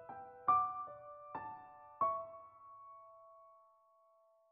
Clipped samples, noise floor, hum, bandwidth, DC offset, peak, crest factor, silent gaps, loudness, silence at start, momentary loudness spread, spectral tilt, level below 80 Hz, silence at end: under 0.1%; -71 dBFS; none; 3.8 kHz; under 0.1%; -22 dBFS; 22 dB; none; -39 LUFS; 0 s; 24 LU; -5.5 dB/octave; -78 dBFS; 1 s